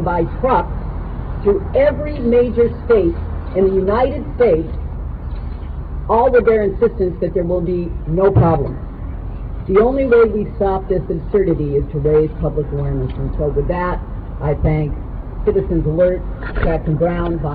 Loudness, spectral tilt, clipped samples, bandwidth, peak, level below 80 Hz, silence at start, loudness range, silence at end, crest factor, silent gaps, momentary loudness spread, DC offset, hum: -17 LUFS; -12 dB/octave; under 0.1%; 4.8 kHz; -2 dBFS; -26 dBFS; 0 s; 3 LU; 0 s; 14 dB; none; 14 LU; 0.2%; none